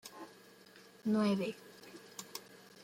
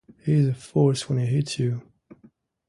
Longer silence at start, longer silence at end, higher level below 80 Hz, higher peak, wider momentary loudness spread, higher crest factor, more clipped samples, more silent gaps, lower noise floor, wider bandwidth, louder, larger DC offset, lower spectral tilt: second, 0.05 s vs 0.25 s; second, 0 s vs 0.9 s; second, -84 dBFS vs -58 dBFS; second, -22 dBFS vs -8 dBFS; first, 25 LU vs 6 LU; about the same, 18 dB vs 18 dB; neither; neither; about the same, -60 dBFS vs -57 dBFS; first, 16.5 kHz vs 11.5 kHz; second, -37 LUFS vs -24 LUFS; neither; second, -5.5 dB/octave vs -7 dB/octave